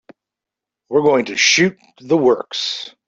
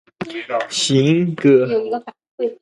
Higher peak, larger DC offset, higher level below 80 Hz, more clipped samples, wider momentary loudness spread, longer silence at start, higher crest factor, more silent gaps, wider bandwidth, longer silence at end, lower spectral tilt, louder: about the same, -2 dBFS vs -2 dBFS; neither; about the same, -62 dBFS vs -62 dBFS; neither; second, 9 LU vs 13 LU; first, 0.9 s vs 0.2 s; about the same, 16 dB vs 16 dB; second, none vs 2.31-2.38 s; second, 8 kHz vs 11.5 kHz; about the same, 0.2 s vs 0.1 s; second, -3 dB/octave vs -5 dB/octave; about the same, -16 LUFS vs -17 LUFS